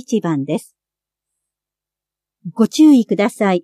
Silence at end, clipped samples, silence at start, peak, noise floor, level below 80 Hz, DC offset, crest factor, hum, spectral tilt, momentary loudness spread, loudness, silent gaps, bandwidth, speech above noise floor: 0.05 s; under 0.1%; 0.1 s; -2 dBFS; -87 dBFS; -70 dBFS; under 0.1%; 14 dB; 50 Hz at -65 dBFS; -6 dB/octave; 16 LU; -15 LUFS; none; 13.5 kHz; 72 dB